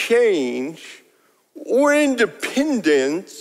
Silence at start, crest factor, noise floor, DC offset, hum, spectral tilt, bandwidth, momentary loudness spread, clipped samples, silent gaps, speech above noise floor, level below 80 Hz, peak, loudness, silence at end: 0 s; 14 dB; -59 dBFS; under 0.1%; none; -3.5 dB/octave; 15.5 kHz; 17 LU; under 0.1%; none; 41 dB; -66 dBFS; -4 dBFS; -19 LUFS; 0 s